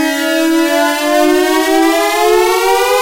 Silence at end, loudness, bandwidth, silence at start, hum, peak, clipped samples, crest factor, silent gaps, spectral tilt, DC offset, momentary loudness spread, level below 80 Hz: 0 s; -11 LUFS; 16 kHz; 0 s; none; -2 dBFS; under 0.1%; 8 dB; none; -1 dB/octave; under 0.1%; 2 LU; -42 dBFS